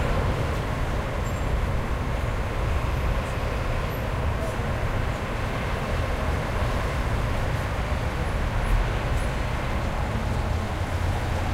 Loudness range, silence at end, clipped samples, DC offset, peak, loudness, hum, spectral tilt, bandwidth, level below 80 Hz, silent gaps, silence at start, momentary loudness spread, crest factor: 1 LU; 0 s; under 0.1%; under 0.1%; -12 dBFS; -27 LUFS; none; -6 dB/octave; 16 kHz; -28 dBFS; none; 0 s; 2 LU; 14 dB